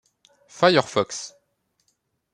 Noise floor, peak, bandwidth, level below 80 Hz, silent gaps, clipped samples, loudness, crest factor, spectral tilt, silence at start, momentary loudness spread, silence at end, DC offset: -72 dBFS; -2 dBFS; 11 kHz; -70 dBFS; none; under 0.1%; -21 LUFS; 24 dB; -4 dB/octave; 0.6 s; 16 LU; 1.05 s; under 0.1%